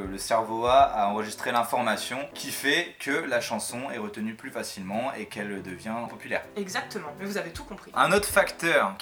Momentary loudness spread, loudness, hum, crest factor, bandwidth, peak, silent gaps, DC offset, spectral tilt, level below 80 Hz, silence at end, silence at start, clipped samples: 13 LU; -27 LUFS; none; 22 dB; over 20 kHz; -4 dBFS; none; under 0.1%; -3 dB/octave; -54 dBFS; 0 s; 0 s; under 0.1%